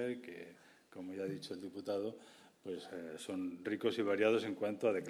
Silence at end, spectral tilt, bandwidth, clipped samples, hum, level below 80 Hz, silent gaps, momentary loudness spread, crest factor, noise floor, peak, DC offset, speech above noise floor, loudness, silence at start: 0 s; -5.5 dB/octave; 13.5 kHz; under 0.1%; none; -86 dBFS; none; 19 LU; 20 dB; -61 dBFS; -18 dBFS; under 0.1%; 22 dB; -39 LUFS; 0 s